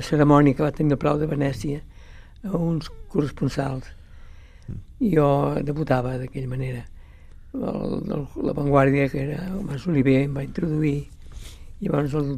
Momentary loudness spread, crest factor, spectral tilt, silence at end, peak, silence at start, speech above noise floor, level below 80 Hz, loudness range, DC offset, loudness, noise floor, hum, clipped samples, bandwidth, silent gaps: 17 LU; 20 dB; -8 dB/octave; 0 s; -2 dBFS; 0 s; 21 dB; -40 dBFS; 5 LU; under 0.1%; -23 LUFS; -44 dBFS; none; under 0.1%; 13.5 kHz; none